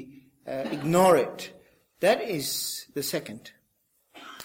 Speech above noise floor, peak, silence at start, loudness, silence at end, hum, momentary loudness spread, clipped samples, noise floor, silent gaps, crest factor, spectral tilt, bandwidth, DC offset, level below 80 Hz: 46 dB; -8 dBFS; 0 s; -26 LUFS; 0 s; none; 24 LU; under 0.1%; -71 dBFS; none; 20 dB; -4 dB/octave; 17 kHz; under 0.1%; -68 dBFS